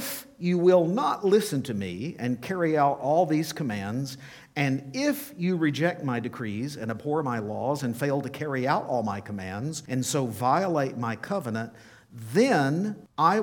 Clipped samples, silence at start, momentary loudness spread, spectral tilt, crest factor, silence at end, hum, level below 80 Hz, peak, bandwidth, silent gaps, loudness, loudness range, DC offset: under 0.1%; 0 s; 10 LU; -6 dB/octave; 18 dB; 0 s; none; -68 dBFS; -8 dBFS; 19 kHz; none; -27 LUFS; 4 LU; under 0.1%